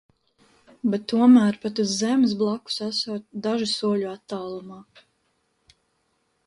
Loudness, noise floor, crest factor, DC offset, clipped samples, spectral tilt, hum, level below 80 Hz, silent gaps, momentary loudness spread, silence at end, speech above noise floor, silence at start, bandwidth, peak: -23 LUFS; -71 dBFS; 18 dB; under 0.1%; under 0.1%; -5 dB/octave; none; -68 dBFS; none; 16 LU; 1.65 s; 48 dB; 0.85 s; 11.5 kHz; -6 dBFS